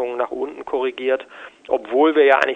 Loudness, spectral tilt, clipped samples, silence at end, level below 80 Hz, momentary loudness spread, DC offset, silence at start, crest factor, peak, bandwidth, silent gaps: -20 LUFS; -4 dB/octave; under 0.1%; 0 s; -62 dBFS; 13 LU; under 0.1%; 0 s; 20 dB; 0 dBFS; 8.6 kHz; none